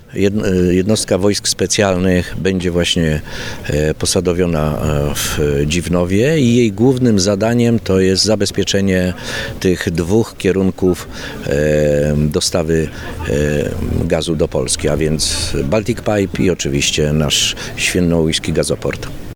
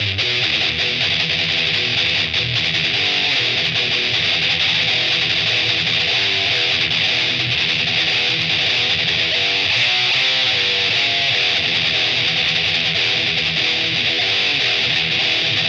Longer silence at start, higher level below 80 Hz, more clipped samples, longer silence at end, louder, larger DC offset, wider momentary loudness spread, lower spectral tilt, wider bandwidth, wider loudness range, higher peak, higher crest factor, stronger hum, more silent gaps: about the same, 0.1 s vs 0 s; first, -30 dBFS vs -50 dBFS; neither; about the same, 0 s vs 0 s; about the same, -15 LUFS vs -15 LUFS; neither; first, 6 LU vs 2 LU; first, -4.5 dB/octave vs -2 dB/octave; first, over 20 kHz vs 10 kHz; about the same, 3 LU vs 1 LU; first, 0 dBFS vs -6 dBFS; about the same, 14 dB vs 12 dB; neither; neither